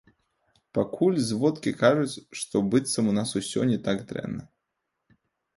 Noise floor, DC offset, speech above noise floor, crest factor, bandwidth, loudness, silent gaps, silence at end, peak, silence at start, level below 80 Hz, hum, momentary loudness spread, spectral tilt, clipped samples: -81 dBFS; under 0.1%; 56 dB; 20 dB; 11.5 kHz; -26 LUFS; none; 1.1 s; -6 dBFS; 0.75 s; -62 dBFS; none; 12 LU; -5.5 dB/octave; under 0.1%